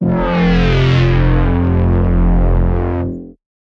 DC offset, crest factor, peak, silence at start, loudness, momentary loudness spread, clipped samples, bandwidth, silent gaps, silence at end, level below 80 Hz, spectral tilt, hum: under 0.1%; 10 dB; -2 dBFS; 0 s; -14 LUFS; 7 LU; under 0.1%; 6.4 kHz; none; 0.4 s; -18 dBFS; -8.5 dB/octave; none